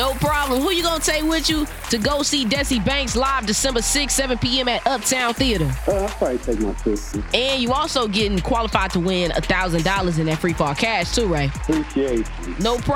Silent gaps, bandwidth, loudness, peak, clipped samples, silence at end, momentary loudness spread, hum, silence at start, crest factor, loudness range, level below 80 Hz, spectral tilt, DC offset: none; 18.5 kHz; -20 LUFS; 0 dBFS; under 0.1%; 0 s; 4 LU; none; 0 s; 20 dB; 2 LU; -30 dBFS; -3.5 dB/octave; under 0.1%